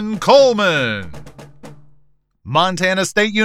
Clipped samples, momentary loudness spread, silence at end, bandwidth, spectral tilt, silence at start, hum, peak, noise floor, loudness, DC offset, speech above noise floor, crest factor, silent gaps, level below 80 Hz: under 0.1%; 11 LU; 0 s; 15 kHz; -4 dB/octave; 0 s; none; 0 dBFS; -54 dBFS; -15 LUFS; under 0.1%; 40 dB; 16 dB; none; -50 dBFS